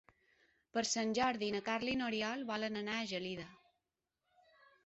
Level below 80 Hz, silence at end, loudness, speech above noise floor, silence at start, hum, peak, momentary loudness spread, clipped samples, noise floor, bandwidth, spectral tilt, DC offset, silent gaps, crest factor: -72 dBFS; 1.3 s; -38 LUFS; 51 dB; 0.75 s; none; -22 dBFS; 7 LU; under 0.1%; -89 dBFS; 8 kHz; -2 dB/octave; under 0.1%; none; 18 dB